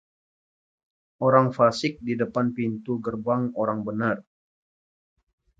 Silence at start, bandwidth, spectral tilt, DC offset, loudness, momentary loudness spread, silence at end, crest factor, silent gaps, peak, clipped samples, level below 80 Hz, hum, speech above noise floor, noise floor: 1.2 s; 8 kHz; -7 dB/octave; under 0.1%; -25 LUFS; 9 LU; 1.4 s; 24 dB; none; -2 dBFS; under 0.1%; -64 dBFS; none; over 66 dB; under -90 dBFS